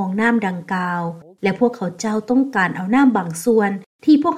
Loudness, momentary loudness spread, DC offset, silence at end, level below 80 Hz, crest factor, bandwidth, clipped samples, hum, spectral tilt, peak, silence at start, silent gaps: -19 LUFS; 8 LU; under 0.1%; 0 s; -62 dBFS; 14 dB; 15 kHz; under 0.1%; none; -6 dB/octave; -4 dBFS; 0 s; 3.86-3.99 s